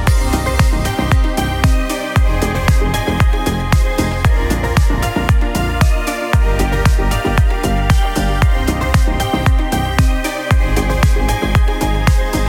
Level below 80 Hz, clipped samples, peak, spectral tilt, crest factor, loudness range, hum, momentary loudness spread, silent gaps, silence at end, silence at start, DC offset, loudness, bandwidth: -16 dBFS; under 0.1%; 0 dBFS; -5.5 dB/octave; 14 dB; 0 LU; none; 2 LU; none; 0 s; 0 s; under 0.1%; -15 LUFS; 17 kHz